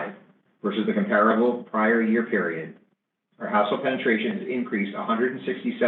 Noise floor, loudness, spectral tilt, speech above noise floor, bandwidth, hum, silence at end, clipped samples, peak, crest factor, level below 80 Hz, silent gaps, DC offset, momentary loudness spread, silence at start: -72 dBFS; -24 LUFS; -9 dB/octave; 48 dB; 4.2 kHz; none; 0 s; under 0.1%; -6 dBFS; 18 dB; -84 dBFS; none; under 0.1%; 10 LU; 0 s